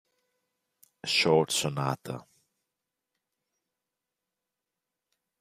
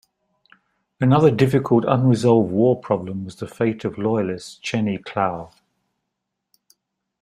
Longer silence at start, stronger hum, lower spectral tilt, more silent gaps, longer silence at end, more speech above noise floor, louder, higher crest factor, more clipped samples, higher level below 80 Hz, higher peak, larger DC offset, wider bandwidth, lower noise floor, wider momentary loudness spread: about the same, 1.05 s vs 1 s; neither; second, -3.5 dB/octave vs -7.5 dB/octave; neither; first, 3.2 s vs 1.75 s; about the same, 60 dB vs 60 dB; second, -27 LUFS vs -20 LUFS; first, 26 dB vs 18 dB; neither; second, -72 dBFS vs -58 dBFS; second, -8 dBFS vs -2 dBFS; neither; first, 15.5 kHz vs 12.5 kHz; first, -87 dBFS vs -79 dBFS; first, 17 LU vs 12 LU